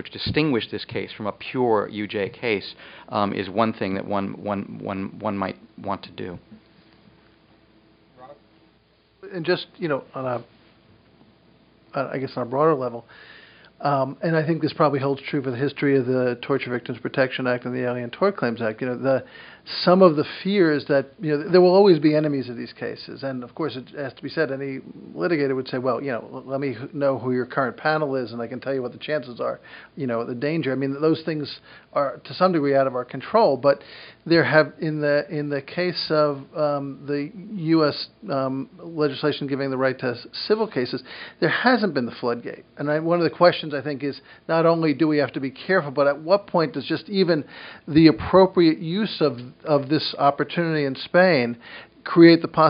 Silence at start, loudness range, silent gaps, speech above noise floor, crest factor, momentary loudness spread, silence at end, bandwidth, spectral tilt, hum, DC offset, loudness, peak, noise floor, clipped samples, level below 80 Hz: 0 s; 10 LU; none; 38 dB; 22 dB; 14 LU; 0 s; 5.4 kHz; -4.5 dB/octave; none; under 0.1%; -23 LUFS; 0 dBFS; -60 dBFS; under 0.1%; -60 dBFS